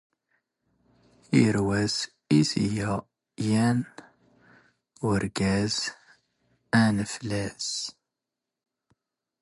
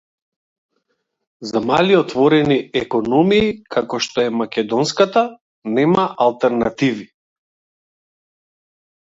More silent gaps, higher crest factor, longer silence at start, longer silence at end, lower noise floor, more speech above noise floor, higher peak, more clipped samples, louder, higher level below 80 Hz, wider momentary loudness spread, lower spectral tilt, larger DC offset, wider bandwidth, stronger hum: second, none vs 5.41-5.62 s; about the same, 20 dB vs 18 dB; about the same, 1.3 s vs 1.4 s; second, 1.5 s vs 2.1 s; first, -87 dBFS vs -71 dBFS; first, 62 dB vs 55 dB; second, -8 dBFS vs 0 dBFS; neither; second, -26 LUFS vs -17 LUFS; about the same, -54 dBFS vs -54 dBFS; about the same, 10 LU vs 8 LU; about the same, -5 dB/octave vs -5.5 dB/octave; neither; first, 11.5 kHz vs 7.8 kHz; neither